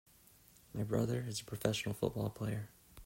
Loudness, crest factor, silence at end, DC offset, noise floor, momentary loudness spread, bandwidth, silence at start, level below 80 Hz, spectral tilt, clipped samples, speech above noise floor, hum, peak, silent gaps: -39 LUFS; 22 dB; 0 s; under 0.1%; -64 dBFS; 9 LU; 16.5 kHz; 0.75 s; -62 dBFS; -5.5 dB/octave; under 0.1%; 27 dB; none; -18 dBFS; none